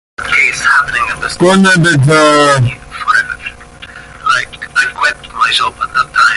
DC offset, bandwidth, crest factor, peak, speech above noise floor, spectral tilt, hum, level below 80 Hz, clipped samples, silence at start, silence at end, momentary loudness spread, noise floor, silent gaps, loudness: under 0.1%; 11.5 kHz; 12 dB; 0 dBFS; 23 dB; -4.5 dB/octave; none; -40 dBFS; under 0.1%; 0.2 s; 0 s; 13 LU; -32 dBFS; none; -10 LUFS